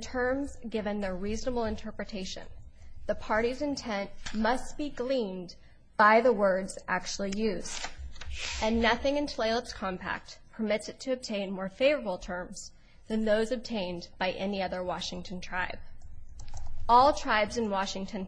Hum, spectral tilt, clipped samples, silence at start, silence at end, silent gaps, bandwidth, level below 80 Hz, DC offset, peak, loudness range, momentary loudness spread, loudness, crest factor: none; -4 dB/octave; under 0.1%; 0 s; 0 s; none; 10.5 kHz; -44 dBFS; under 0.1%; -10 dBFS; 6 LU; 16 LU; -30 LUFS; 20 dB